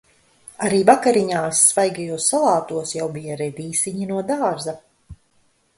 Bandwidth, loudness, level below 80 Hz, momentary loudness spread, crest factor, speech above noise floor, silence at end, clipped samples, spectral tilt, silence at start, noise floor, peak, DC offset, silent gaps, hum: 12 kHz; -19 LUFS; -56 dBFS; 13 LU; 20 dB; 42 dB; 0.65 s; under 0.1%; -3.5 dB/octave; 0.6 s; -62 dBFS; 0 dBFS; under 0.1%; none; none